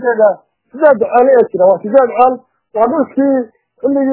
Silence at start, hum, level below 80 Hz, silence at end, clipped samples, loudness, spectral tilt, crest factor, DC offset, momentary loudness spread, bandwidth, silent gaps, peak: 0 s; none; -60 dBFS; 0 s; 0.3%; -12 LUFS; -10.5 dB/octave; 12 dB; under 0.1%; 12 LU; 4 kHz; none; 0 dBFS